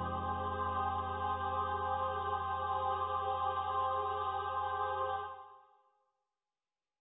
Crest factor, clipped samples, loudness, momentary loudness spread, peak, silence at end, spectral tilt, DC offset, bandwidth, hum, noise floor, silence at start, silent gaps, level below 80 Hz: 14 dB; under 0.1%; -36 LUFS; 2 LU; -24 dBFS; 1.4 s; -1 dB/octave; under 0.1%; 3.9 kHz; none; under -90 dBFS; 0 s; none; -54 dBFS